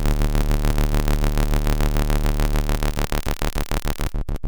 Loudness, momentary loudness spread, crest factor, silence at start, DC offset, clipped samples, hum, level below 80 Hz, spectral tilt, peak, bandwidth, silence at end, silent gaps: -24 LUFS; 4 LU; 18 dB; 0 s; under 0.1%; under 0.1%; none; -20 dBFS; -5.5 dB/octave; -2 dBFS; over 20 kHz; 0 s; none